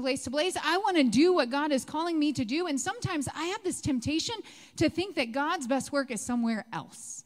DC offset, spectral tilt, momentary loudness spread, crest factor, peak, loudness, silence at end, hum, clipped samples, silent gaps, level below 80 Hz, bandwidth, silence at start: under 0.1%; -4 dB/octave; 9 LU; 18 dB; -12 dBFS; -29 LUFS; 0.05 s; none; under 0.1%; none; -60 dBFS; 15.5 kHz; 0 s